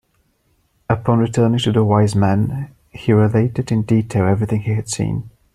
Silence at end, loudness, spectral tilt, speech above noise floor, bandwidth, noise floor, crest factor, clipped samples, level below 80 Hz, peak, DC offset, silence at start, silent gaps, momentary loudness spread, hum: 0.25 s; -17 LUFS; -7 dB/octave; 46 dB; 11.5 kHz; -62 dBFS; 16 dB; under 0.1%; -46 dBFS; 0 dBFS; under 0.1%; 0.9 s; none; 9 LU; none